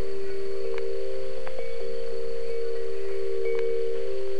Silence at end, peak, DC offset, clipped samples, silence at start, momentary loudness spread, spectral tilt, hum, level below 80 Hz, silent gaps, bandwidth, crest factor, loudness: 0 s; -14 dBFS; 10%; under 0.1%; 0 s; 7 LU; -6 dB/octave; none; -56 dBFS; none; 12 kHz; 12 dB; -32 LUFS